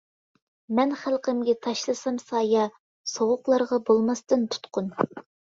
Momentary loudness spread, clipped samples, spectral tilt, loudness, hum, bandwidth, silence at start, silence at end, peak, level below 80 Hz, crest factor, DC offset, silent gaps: 8 LU; under 0.1%; -4.5 dB/octave; -26 LUFS; none; 7.8 kHz; 0.7 s; 0.35 s; -6 dBFS; -70 dBFS; 20 dB; under 0.1%; 2.80-3.04 s